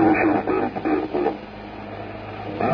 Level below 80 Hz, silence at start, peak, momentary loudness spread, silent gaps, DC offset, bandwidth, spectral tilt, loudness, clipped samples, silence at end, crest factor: -48 dBFS; 0 s; -6 dBFS; 15 LU; none; under 0.1%; 5.4 kHz; -9 dB/octave; -24 LUFS; under 0.1%; 0 s; 16 dB